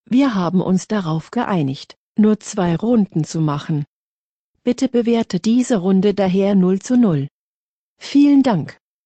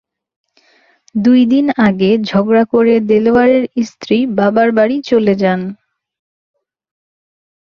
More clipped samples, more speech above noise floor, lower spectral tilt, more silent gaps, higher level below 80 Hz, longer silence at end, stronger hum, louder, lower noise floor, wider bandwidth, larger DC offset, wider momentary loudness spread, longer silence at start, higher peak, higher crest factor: neither; first, over 74 dB vs 42 dB; about the same, -7 dB/octave vs -7.5 dB/octave; first, 1.97-2.15 s, 3.87-4.54 s, 7.31-7.96 s vs none; about the same, -56 dBFS vs -52 dBFS; second, 0.35 s vs 1.9 s; neither; second, -17 LUFS vs -12 LUFS; first, under -90 dBFS vs -53 dBFS; first, 8.8 kHz vs 7 kHz; neither; about the same, 9 LU vs 7 LU; second, 0.1 s vs 1.15 s; about the same, -4 dBFS vs -2 dBFS; about the same, 12 dB vs 12 dB